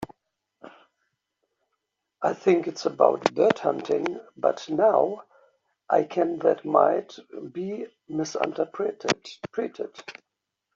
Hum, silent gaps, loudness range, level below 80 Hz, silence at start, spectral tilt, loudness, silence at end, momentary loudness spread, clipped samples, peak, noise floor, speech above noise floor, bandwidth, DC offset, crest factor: none; none; 7 LU; -72 dBFS; 0 s; -5 dB/octave; -25 LUFS; 0.65 s; 16 LU; under 0.1%; -2 dBFS; -82 dBFS; 57 dB; 7.8 kHz; under 0.1%; 24 dB